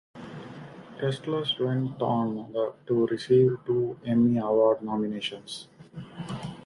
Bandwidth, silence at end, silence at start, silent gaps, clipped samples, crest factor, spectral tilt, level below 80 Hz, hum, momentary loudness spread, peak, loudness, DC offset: 11 kHz; 0 s; 0.15 s; none; under 0.1%; 18 dB; -7 dB/octave; -64 dBFS; none; 20 LU; -10 dBFS; -26 LUFS; under 0.1%